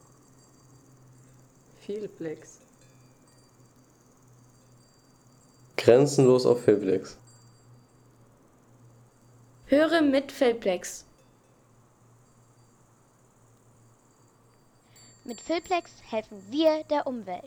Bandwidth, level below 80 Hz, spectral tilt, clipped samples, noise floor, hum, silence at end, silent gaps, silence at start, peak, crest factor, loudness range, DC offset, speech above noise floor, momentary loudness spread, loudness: 18 kHz; -66 dBFS; -5.5 dB/octave; under 0.1%; -61 dBFS; none; 0 s; none; 1.9 s; -6 dBFS; 24 dB; 19 LU; under 0.1%; 36 dB; 20 LU; -25 LUFS